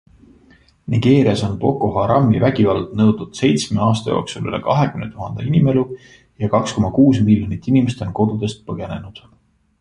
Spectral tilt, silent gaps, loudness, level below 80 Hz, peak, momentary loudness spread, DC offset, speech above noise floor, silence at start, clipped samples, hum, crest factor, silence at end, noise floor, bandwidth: -7 dB/octave; none; -17 LUFS; -42 dBFS; -2 dBFS; 13 LU; under 0.1%; 35 dB; 0.9 s; under 0.1%; none; 16 dB; 0.6 s; -51 dBFS; 11 kHz